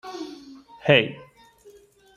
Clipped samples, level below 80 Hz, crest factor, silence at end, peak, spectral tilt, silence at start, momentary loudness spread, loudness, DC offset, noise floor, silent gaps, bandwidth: under 0.1%; -64 dBFS; 24 dB; 1 s; -2 dBFS; -6 dB/octave; 0.05 s; 25 LU; -21 LUFS; under 0.1%; -52 dBFS; none; 11 kHz